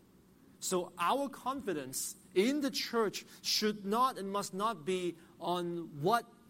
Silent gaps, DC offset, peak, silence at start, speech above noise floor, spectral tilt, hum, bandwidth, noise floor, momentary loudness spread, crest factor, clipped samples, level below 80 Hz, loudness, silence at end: none; under 0.1%; -18 dBFS; 0.6 s; 28 dB; -3.5 dB/octave; none; 16.5 kHz; -62 dBFS; 7 LU; 18 dB; under 0.1%; -74 dBFS; -35 LUFS; 0.2 s